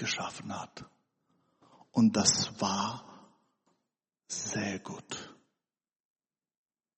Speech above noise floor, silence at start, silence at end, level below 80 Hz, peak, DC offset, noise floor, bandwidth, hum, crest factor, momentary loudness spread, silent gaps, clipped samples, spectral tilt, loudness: over 58 dB; 0 s; 1.65 s; -72 dBFS; -8 dBFS; under 0.1%; under -90 dBFS; 8.4 kHz; none; 28 dB; 19 LU; none; under 0.1%; -3 dB/octave; -31 LUFS